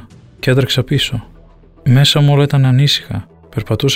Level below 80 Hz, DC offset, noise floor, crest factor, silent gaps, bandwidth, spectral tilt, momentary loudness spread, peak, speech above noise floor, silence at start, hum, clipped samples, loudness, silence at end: -40 dBFS; under 0.1%; -42 dBFS; 12 dB; none; 16 kHz; -5.5 dB/octave; 16 LU; -2 dBFS; 30 dB; 0.45 s; none; under 0.1%; -13 LUFS; 0 s